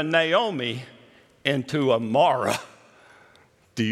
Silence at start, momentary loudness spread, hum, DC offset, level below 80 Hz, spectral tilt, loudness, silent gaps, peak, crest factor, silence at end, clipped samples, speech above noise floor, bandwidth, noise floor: 0 s; 10 LU; none; under 0.1%; -72 dBFS; -5 dB/octave; -23 LUFS; none; -6 dBFS; 20 dB; 0 s; under 0.1%; 35 dB; 15 kHz; -57 dBFS